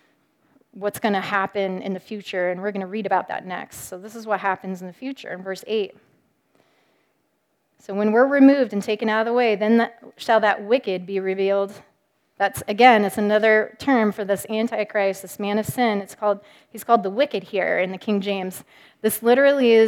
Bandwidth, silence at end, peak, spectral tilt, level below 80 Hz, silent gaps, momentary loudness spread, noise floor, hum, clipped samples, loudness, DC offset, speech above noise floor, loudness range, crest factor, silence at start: 18 kHz; 0 s; 0 dBFS; -5 dB/octave; -66 dBFS; none; 16 LU; -70 dBFS; none; under 0.1%; -21 LUFS; under 0.1%; 49 dB; 10 LU; 22 dB; 0.75 s